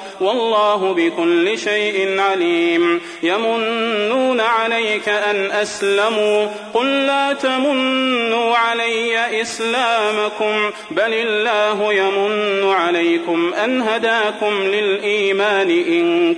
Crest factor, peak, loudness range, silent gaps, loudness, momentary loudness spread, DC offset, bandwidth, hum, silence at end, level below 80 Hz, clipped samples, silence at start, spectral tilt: 12 dB; -4 dBFS; 1 LU; none; -17 LUFS; 3 LU; under 0.1%; 10.5 kHz; none; 0 s; -66 dBFS; under 0.1%; 0 s; -3.5 dB/octave